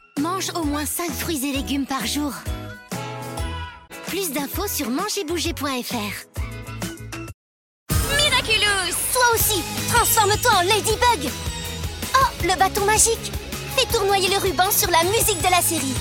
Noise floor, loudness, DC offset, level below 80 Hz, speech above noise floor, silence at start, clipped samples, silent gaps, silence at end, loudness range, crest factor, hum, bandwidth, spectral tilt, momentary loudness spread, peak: under -90 dBFS; -20 LUFS; under 0.1%; -38 dBFS; over 69 dB; 0.15 s; under 0.1%; 7.34-7.86 s; 0 s; 9 LU; 18 dB; none; 17 kHz; -2.5 dB/octave; 15 LU; -4 dBFS